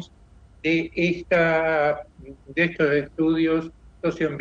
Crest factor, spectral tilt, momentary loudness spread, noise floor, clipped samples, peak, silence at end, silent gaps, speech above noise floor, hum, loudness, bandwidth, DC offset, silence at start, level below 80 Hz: 14 dB; -7 dB/octave; 9 LU; -51 dBFS; under 0.1%; -8 dBFS; 0 s; none; 28 dB; none; -23 LUFS; 7.2 kHz; under 0.1%; 0 s; -50 dBFS